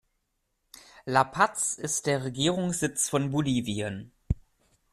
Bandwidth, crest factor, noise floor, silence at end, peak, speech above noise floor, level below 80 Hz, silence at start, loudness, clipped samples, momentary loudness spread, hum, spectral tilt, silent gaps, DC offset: 14.5 kHz; 24 dB; -77 dBFS; 0.55 s; -6 dBFS; 50 dB; -46 dBFS; 0.95 s; -28 LUFS; under 0.1%; 10 LU; none; -4 dB/octave; none; under 0.1%